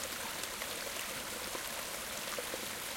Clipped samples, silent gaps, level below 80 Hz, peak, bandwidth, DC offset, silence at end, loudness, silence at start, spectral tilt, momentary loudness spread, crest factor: under 0.1%; none; -64 dBFS; -20 dBFS; 17 kHz; under 0.1%; 0 s; -38 LUFS; 0 s; -0.5 dB/octave; 1 LU; 20 dB